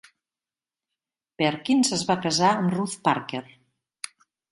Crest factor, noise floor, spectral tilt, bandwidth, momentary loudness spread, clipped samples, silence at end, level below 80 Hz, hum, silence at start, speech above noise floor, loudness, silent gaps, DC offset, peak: 20 dB; under -90 dBFS; -4 dB/octave; 11.5 kHz; 18 LU; under 0.1%; 1.1 s; -66 dBFS; none; 1.4 s; over 67 dB; -24 LUFS; none; under 0.1%; -6 dBFS